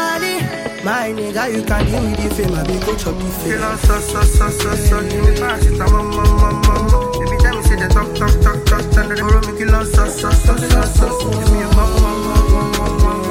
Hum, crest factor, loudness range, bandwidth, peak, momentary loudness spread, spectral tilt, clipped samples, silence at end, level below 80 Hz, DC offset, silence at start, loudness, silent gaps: none; 12 dB; 3 LU; 16.5 kHz; 0 dBFS; 5 LU; -5.5 dB/octave; under 0.1%; 0 s; -16 dBFS; under 0.1%; 0 s; -16 LUFS; none